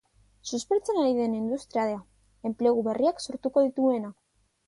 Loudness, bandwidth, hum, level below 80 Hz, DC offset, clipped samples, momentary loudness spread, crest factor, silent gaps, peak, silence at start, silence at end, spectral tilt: -27 LUFS; 11.5 kHz; none; -66 dBFS; under 0.1%; under 0.1%; 11 LU; 16 dB; none; -12 dBFS; 0.45 s; 0.55 s; -5 dB/octave